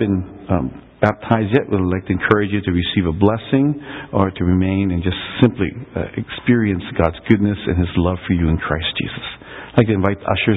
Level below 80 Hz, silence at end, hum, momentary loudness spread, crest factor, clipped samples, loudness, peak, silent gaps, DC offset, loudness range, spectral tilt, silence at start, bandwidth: -32 dBFS; 0 s; none; 8 LU; 18 dB; under 0.1%; -18 LUFS; 0 dBFS; none; under 0.1%; 1 LU; -9.5 dB/octave; 0 s; 4.1 kHz